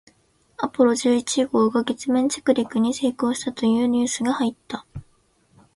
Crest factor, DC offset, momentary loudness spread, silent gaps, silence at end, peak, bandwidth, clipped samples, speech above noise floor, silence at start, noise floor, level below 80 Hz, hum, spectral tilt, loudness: 18 dB; under 0.1%; 12 LU; none; 0.75 s; -6 dBFS; 11.5 kHz; under 0.1%; 40 dB; 0.6 s; -61 dBFS; -58 dBFS; none; -4 dB/octave; -22 LUFS